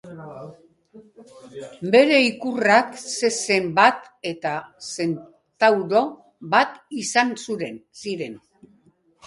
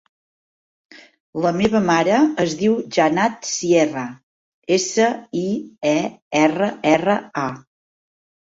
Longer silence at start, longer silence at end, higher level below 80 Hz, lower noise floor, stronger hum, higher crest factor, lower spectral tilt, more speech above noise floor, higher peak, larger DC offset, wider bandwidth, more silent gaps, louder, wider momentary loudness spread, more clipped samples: second, 0.05 s vs 1.35 s; about the same, 0.9 s vs 0.9 s; second, -70 dBFS vs -58 dBFS; second, -60 dBFS vs under -90 dBFS; neither; about the same, 22 dB vs 18 dB; about the same, -3.5 dB/octave vs -4.5 dB/octave; second, 38 dB vs over 71 dB; about the same, -2 dBFS vs -2 dBFS; neither; first, 11.5 kHz vs 8 kHz; second, none vs 4.23-4.62 s, 6.22-6.31 s; about the same, -21 LUFS vs -19 LUFS; first, 20 LU vs 9 LU; neither